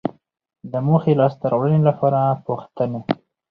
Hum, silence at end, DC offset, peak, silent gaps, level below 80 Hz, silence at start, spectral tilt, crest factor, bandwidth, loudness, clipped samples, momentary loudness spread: none; 0.35 s; under 0.1%; -2 dBFS; none; -60 dBFS; 0.05 s; -11 dB/octave; 18 dB; 5.2 kHz; -20 LUFS; under 0.1%; 11 LU